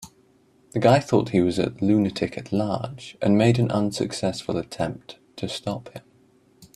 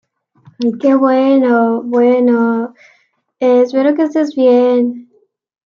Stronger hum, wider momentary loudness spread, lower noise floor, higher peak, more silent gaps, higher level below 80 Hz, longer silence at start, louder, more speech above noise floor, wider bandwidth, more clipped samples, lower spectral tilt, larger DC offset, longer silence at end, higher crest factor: neither; first, 14 LU vs 9 LU; about the same, -59 dBFS vs -56 dBFS; about the same, -4 dBFS vs -2 dBFS; neither; first, -56 dBFS vs -68 dBFS; second, 0 s vs 0.6 s; second, -23 LUFS vs -12 LUFS; second, 36 dB vs 44 dB; first, 13 kHz vs 6.8 kHz; neither; about the same, -6.5 dB/octave vs -7 dB/octave; neither; second, 0.1 s vs 0.65 s; first, 20 dB vs 10 dB